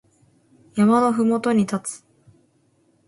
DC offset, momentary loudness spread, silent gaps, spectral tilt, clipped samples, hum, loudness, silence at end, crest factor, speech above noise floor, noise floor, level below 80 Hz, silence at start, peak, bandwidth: under 0.1%; 15 LU; none; -6 dB/octave; under 0.1%; none; -20 LUFS; 1.1 s; 16 dB; 44 dB; -62 dBFS; -64 dBFS; 0.75 s; -6 dBFS; 11.5 kHz